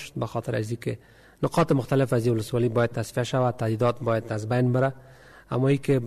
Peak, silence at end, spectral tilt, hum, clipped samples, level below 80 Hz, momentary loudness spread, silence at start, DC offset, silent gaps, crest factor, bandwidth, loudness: -12 dBFS; 0 s; -7 dB/octave; none; under 0.1%; -54 dBFS; 8 LU; 0 s; under 0.1%; none; 14 dB; 13.5 kHz; -25 LUFS